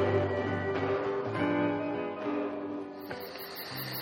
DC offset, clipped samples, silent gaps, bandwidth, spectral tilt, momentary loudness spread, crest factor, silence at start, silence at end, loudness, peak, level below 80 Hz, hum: under 0.1%; under 0.1%; none; 16.5 kHz; -6.5 dB/octave; 11 LU; 16 dB; 0 s; 0 s; -33 LUFS; -16 dBFS; -66 dBFS; none